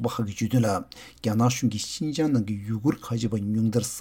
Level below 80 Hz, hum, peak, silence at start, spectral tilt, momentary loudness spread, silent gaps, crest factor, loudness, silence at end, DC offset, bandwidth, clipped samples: -56 dBFS; none; -10 dBFS; 0 s; -6 dB/octave; 6 LU; none; 16 dB; -26 LUFS; 0 s; under 0.1%; 17 kHz; under 0.1%